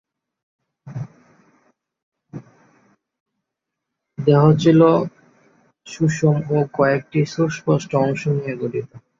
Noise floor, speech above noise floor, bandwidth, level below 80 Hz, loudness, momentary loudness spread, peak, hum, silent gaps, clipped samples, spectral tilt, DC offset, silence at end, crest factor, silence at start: -82 dBFS; 64 dB; 7.4 kHz; -60 dBFS; -18 LUFS; 24 LU; -2 dBFS; none; 2.03-2.12 s, 3.20-3.26 s; under 0.1%; -7.5 dB/octave; under 0.1%; 0.2 s; 18 dB; 0.85 s